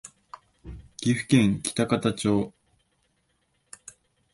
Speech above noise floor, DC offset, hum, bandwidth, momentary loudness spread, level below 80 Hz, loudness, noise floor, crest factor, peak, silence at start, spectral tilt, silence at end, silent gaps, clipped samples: 48 dB; under 0.1%; none; 11.5 kHz; 24 LU; -54 dBFS; -25 LUFS; -71 dBFS; 20 dB; -6 dBFS; 0.05 s; -5.5 dB/octave; 1.85 s; none; under 0.1%